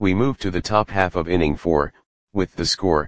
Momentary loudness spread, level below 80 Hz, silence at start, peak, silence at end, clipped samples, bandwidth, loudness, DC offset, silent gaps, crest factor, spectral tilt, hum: 7 LU; -38 dBFS; 0 s; 0 dBFS; 0 s; under 0.1%; 9.8 kHz; -21 LUFS; 1%; 2.06-2.27 s; 20 dB; -5.5 dB/octave; none